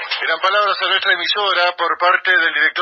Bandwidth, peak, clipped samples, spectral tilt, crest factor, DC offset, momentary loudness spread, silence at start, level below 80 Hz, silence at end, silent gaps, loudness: 7 kHz; -2 dBFS; under 0.1%; -1 dB/octave; 16 dB; under 0.1%; 4 LU; 0 s; -70 dBFS; 0 s; none; -15 LUFS